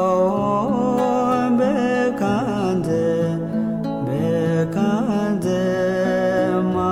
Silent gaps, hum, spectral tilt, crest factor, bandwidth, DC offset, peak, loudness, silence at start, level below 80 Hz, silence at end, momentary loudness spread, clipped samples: none; none; -7.5 dB/octave; 10 dB; 15 kHz; under 0.1%; -8 dBFS; -20 LUFS; 0 s; -50 dBFS; 0 s; 4 LU; under 0.1%